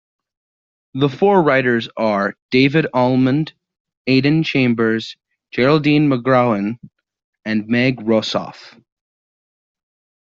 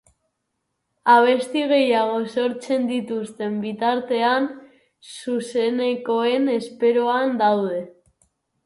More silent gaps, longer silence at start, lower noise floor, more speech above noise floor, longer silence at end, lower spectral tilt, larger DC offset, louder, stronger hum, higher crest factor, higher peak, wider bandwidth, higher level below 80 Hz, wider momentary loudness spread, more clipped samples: first, 2.42-2.49 s, 3.80-3.85 s, 3.97-4.05 s, 7.24-7.33 s vs none; about the same, 0.95 s vs 1.05 s; first, under -90 dBFS vs -76 dBFS; first, over 74 dB vs 56 dB; first, 1.55 s vs 0.75 s; about the same, -5 dB/octave vs -5 dB/octave; neither; first, -16 LUFS vs -21 LUFS; neither; about the same, 16 dB vs 20 dB; about the same, -2 dBFS vs -2 dBFS; second, 7.4 kHz vs 11.5 kHz; first, -56 dBFS vs -72 dBFS; first, 13 LU vs 10 LU; neither